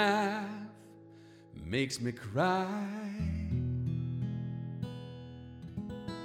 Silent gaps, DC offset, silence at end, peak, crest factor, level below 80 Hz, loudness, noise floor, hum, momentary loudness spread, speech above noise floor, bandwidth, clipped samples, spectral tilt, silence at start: none; under 0.1%; 0 s; -16 dBFS; 20 dB; -52 dBFS; -35 LUFS; -55 dBFS; none; 19 LU; 23 dB; 15 kHz; under 0.1%; -6 dB/octave; 0 s